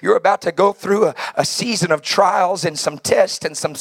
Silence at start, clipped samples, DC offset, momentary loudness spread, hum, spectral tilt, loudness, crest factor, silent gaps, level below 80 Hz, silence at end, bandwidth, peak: 0 s; under 0.1%; under 0.1%; 6 LU; none; -3.5 dB/octave; -17 LUFS; 16 dB; none; -64 dBFS; 0 s; 16.5 kHz; 0 dBFS